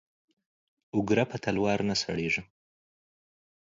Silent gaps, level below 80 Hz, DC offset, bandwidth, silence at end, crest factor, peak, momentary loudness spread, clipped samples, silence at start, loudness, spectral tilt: none; -60 dBFS; under 0.1%; 7.6 kHz; 1.35 s; 22 dB; -10 dBFS; 5 LU; under 0.1%; 0.95 s; -29 LUFS; -5 dB/octave